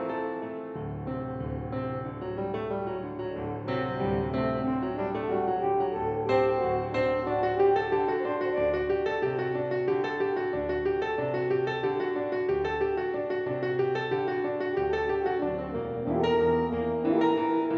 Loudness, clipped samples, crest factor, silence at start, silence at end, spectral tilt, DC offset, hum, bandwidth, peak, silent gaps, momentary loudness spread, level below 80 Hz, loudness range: -29 LUFS; under 0.1%; 16 dB; 0 s; 0 s; -8.5 dB/octave; under 0.1%; none; 6.4 kHz; -12 dBFS; none; 9 LU; -50 dBFS; 5 LU